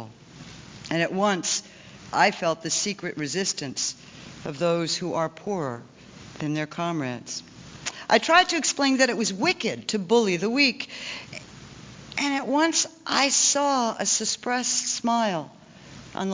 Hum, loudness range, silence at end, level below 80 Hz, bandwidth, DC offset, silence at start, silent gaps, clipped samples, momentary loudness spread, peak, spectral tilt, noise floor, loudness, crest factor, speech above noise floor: none; 7 LU; 0 s; -64 dBFS; 7.8 kHz; under 0.1%; 0 s; none; under 0.1%; 21 LU; -6 dBFS; -2.5 dB/octave; -46 dBFS; -24 LUFS; 20 dB; 21 dB